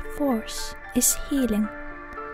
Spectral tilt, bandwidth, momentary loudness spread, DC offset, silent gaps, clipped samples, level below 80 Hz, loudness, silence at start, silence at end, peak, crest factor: -3 dB/octave; 16 kHz; 16 LU; under 0.1%; none; under 0.1%; -38 dBFS; -25 LUFS; 0 s; 0 s; -8 dBFS; 18 dB